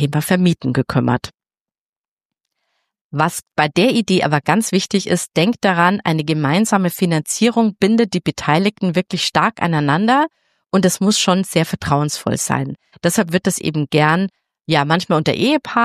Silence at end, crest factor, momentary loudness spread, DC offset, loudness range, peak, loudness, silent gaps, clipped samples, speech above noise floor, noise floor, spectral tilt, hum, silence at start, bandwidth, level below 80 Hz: 0 s; 16 dB; 5 LU; under 0.1%; 4 LU; 0 dBFS; -17 LUFS; 1.34-1.38 s, 1.61-1.65 s, 1.78-2.17 s, 2.25-2.30 s, 3.01-3.10 s; under 0.1%; over 74 dB; under -90 dBFS; -5 dB/octave; none; 0 s; 15 kHz; -52 dBFS